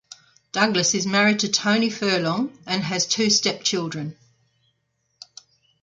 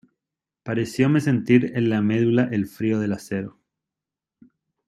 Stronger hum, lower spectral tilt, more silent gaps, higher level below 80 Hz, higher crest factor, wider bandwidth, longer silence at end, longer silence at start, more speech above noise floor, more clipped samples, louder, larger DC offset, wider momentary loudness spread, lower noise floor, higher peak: neither; second, -3 dB/octave vs -7.5 dB/octave; neither; about the same, -66 dBFS vs -62 dBFS; about the same, 22 dB vs 20 dB; second, 9.2 kHz vs 13.5 kHz; first, 1.7 s vs 1.4 s; about the same, 0.55 s vs 0.65 s; second, 50 dB vs 67 dB; neither; about the same, -21 LUFS vs -22 LUFS; neither; about the same, 9 LU vs 11 LU; second, -72 dBFS vs -88 dBFS; about the same, -2 dBFS vs -4 dBFS